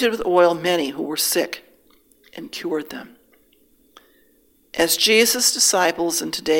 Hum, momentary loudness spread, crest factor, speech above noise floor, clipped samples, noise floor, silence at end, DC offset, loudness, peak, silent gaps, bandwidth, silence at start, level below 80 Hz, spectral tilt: none; 19 LU; 18 dB; 39 dB; under 0.1%; -59 dBFS; 0 s; under 0.1%; -18 LUFS; -2 dBFS; none; 17 kHz; 0 s; -58 dBFS; -1.5 dB/octave